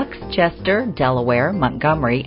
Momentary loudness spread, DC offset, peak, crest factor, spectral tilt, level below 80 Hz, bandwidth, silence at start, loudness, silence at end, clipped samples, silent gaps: 2 LU; under 0.1%; -2 dBFS; 16 dB; -5 dB/octave; -40 dBFS; 5.6 kHz; 0 s; -18 LUFS; 0 s; under 0.1%; none